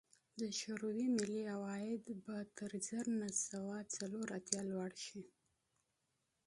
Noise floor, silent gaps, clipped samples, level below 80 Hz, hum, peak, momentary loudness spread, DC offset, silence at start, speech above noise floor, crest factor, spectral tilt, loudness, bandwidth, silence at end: -85 dBFS; none; under 0.1%; -84 dBFS; none; -14 dBFS; 9 LU; under 0.1%; 0.35 s; 43 dB; 30 dB; -4 dB/octave; -43 LUFS; 11.5 kHz; 1.2 s